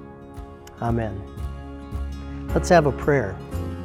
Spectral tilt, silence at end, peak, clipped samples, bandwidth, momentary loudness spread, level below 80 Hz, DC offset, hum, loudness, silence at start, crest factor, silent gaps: -6.5 dB/octave; 0 s; -2 dBFS; under 0.1%; 16 kHz; 22 LU; -36 dBFS; under 0.1%; none; -24 LUFS; 0 s; 22 dB; none